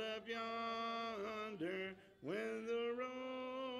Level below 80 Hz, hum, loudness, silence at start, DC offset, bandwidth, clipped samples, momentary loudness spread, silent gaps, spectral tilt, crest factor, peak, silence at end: -80 dBFS; none; -44 LUFS; 0 s; under 0.1%; 13 kHz; under 0.1%; 5 LU; none; -4.5 dB/octave; 12 dB; -32 dBFS; 0 s